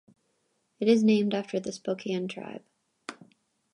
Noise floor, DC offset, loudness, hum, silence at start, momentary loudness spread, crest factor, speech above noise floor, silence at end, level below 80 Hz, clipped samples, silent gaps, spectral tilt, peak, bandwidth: -74 dBFS; under 0.1%; -27 LUFS; none; 0.8 s; 22 LU; 18 dB; 48 dB; 0.6 s; -78 dBFS; under 0.1%; none; -6 dB/octave; -10 dBFS; 10.5 kHz